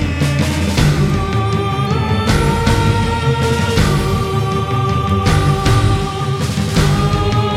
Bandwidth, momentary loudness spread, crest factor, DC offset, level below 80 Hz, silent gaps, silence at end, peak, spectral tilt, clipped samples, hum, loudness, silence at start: 15.5 kHz; 3 LU; 14 dB; under 0.1%; -24 dBFS; none; 0 s; 0 dBFS; -6 dB/octave; under 0.1%; none; -15 LUFS; 0 s